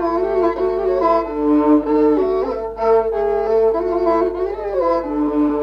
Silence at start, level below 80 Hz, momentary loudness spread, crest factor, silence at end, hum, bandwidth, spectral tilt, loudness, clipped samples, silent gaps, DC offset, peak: 0 s; -40 dBFS; 6 LU; 12 dB; 0 s; 50 Hz at -40 dBFS; 6 kHz; -8 dB/octave; -17 LUFS; under 0.1%; none; under 0.1%; -4 dBFS